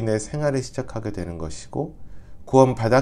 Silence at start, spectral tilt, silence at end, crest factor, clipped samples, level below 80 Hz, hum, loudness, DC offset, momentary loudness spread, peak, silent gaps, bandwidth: 0 s; -6.5 dB/octave; 0 s; 20 dB; under 0.1%; -44 dBFS; none; -23 LUFS; under 0.1%; 14 LU; -2 dBFS; none; 11.5 kHz